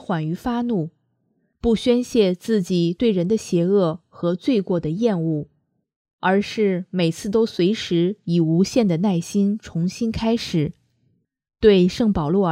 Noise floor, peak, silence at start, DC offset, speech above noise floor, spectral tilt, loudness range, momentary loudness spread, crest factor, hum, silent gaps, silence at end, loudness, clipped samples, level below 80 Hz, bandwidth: -68 dBFS; -2 dBFS; 0 s; under 0.1%; 48 dB; -6.5 dB/octave; 2 LU; 7 LU; 18 dB; none; 5.96-6.05 s, 6.13-6.18 s; 0 s; -21 LUFS; under 0.1%; -46 dBFS; 14 kHz